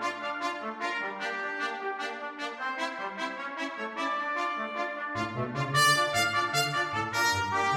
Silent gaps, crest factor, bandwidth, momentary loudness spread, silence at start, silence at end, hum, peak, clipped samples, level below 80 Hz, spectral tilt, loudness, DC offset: none; 20 dB; 16.5 kHz; 10 LU; 0 s; 0 s; none; -12 dBFS; under 0.1%; -66 dBFS; -3 dB/octave; -30 LUFS; under 0.1%